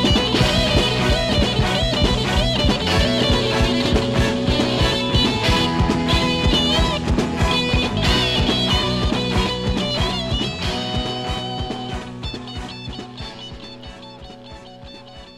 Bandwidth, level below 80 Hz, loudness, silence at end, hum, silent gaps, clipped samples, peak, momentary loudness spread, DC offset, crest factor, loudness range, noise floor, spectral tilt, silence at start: 15 kHz; -28 dBFS; -19 LUFS; 0 s; none; none; under 0.1%; -4 dBFS; 18 LU; under 0.1%; 16 dB; 11 LU; -39 dBFS; -5 dB/octave; 0 s